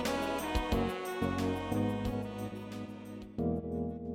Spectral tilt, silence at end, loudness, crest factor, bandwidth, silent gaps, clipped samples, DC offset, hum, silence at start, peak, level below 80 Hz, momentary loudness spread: -6 dB/octave; 0 s; -36 LUFS; 16 dB; 16.5 kHz; none; under 0.1%; under 0.1%; none; 0 s; -18 dBFS; -46 dBFS; 10 LU